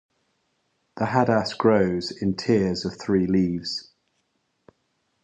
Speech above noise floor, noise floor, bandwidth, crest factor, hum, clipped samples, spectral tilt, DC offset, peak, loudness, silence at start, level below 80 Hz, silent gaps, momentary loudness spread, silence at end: 50 dB; -73 dBFS; 8.8 kHz; 20 dB; none; under 0.1%; -6.5 dB/octave; under 0.1%; -4 dBFS; -23 LUFS; 0.95 s; -52 dBFS; none; 9 LU; 1.4 s